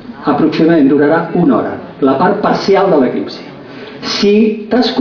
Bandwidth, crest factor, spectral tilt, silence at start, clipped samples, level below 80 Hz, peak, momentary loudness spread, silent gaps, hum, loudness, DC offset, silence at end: 5.4 kHz; 10 dB; -6.5 dB/octave; 0 s; under 0.1%; -48 dBFS; 0 dBFS; 15 LU; none; none; -11 LUFS; under 0.1%; 0 s